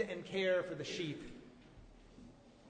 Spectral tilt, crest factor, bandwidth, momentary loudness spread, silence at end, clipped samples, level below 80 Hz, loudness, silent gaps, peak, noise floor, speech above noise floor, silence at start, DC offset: -5 dB/octave; 18 dB; 9.4 kHz; 25 LU; 0 s; under 0.1%; -66 dBFS; -39 LUFS; none; -22 dBFS; -59 dBFS; 21 dB; 0 s; under 0.1%